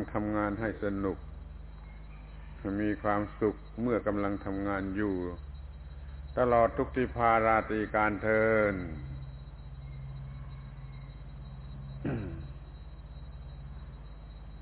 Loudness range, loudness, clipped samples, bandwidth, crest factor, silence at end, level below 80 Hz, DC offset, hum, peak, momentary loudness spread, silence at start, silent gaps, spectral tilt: 15 LU; -31 LUFS; under 0.1%; 4 kHz; 22 dB; 0 s; -46 dBFS; under 0.1%; none; -12 dBFS; 21 LU; 0 s; none; -6.5 dB/octave